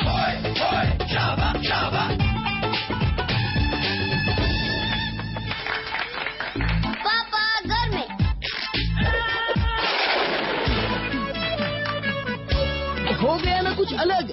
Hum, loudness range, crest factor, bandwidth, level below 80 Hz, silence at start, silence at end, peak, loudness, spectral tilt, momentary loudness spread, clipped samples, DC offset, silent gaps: none; 2 LU; 14 dB; 6 kHz; -32 dBFS; 0 s; 0 s; -10 dBFS; -23 LUFS; -3 dB/octave; 5 LU; under 0.1%; under 0.1%; none